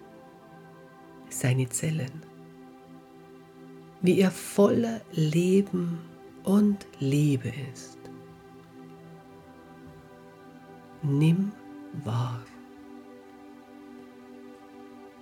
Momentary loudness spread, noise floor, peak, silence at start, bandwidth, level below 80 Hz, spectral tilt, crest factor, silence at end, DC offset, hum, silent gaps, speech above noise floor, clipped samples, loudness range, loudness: 26 LU; -50 dBFS; -10 dBFS; 0 s; 17.5 kHz; -66 dBFS; -6.5 dB/octave; 20 dB; 0.1 s; under 0.1%; none; none; 25 dB; under 0.1%; 13 LU; -27 LUFS